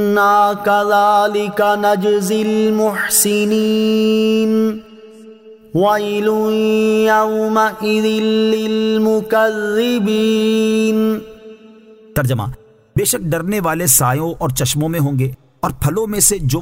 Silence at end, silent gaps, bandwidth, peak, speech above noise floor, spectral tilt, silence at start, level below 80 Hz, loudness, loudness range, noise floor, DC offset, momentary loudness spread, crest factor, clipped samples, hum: 0 s; none; 16.5 kHz; -2 dBFS; 27 dB; -4.5 dB/octave; 0 s; -42 dBFS; -15 LUFS; 3 LU; -42 dBFS; under 0.1%; 7 LU; 14 dB; under 0.1%; none